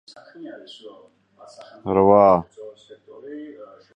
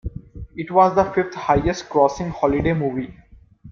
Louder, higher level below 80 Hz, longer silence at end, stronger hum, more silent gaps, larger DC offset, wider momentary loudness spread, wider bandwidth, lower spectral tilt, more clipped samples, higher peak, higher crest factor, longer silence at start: first, -16 LUFS vs -20 LUFS; second, -54 dBFS vs -40 dBFS; first, 0.3 s vs 0 s; neither; neither; neither; first, 28 LU vs 18 LU; first, 8.8 kHz vs 7.4 kHz; first, -8.5 dB/octave vs -7 dB/octave; neither; about the same, -2 dBFS vs -2 dBFS; about the same, 20 dB vs 18 dB; first, 0.4 s vs 0.05 s